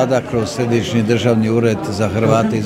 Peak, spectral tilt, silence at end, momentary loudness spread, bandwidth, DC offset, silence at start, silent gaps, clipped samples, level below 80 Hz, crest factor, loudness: 0 dBFS; -6.5 dB/octave; 0 s; 4 LU; 15 kHz; under 0.1%; 0 s; none; under 0.1%; -48 dBFS; 16 dB; -16 LUFS